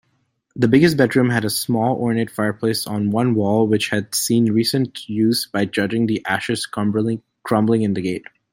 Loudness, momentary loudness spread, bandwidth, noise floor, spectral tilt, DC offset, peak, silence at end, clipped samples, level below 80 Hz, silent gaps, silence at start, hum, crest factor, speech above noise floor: -19 LUFS; 7 LU; 16.5 kHz; -67 dBFS; -5 dB/octave; under 0.1%; -2 dBFS; 0.3 s; under 0.1%; -56 dBFS; none; 0.55 s; none; 18 dB; 48 dB